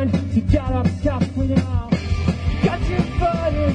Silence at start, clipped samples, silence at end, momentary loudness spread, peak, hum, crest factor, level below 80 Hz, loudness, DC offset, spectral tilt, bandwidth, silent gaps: 0 s; under 0.1%; 0 s; 3 LU; -4 dBFS; none; 16 dB; -28 dBFS; -21 LUFS; under 0.1%; -8 dB/octave; 9.6 kHz; none